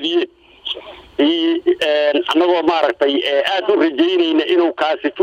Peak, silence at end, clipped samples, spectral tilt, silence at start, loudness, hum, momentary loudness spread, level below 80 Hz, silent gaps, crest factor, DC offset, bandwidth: -2 dBFS; 0 s; under 0.1%; -4 dB/octave; 0 s; -16 LUFS; none; 11 LU; -58 dBFS; none; 14 dB; under 0.1%; 9.4 kHz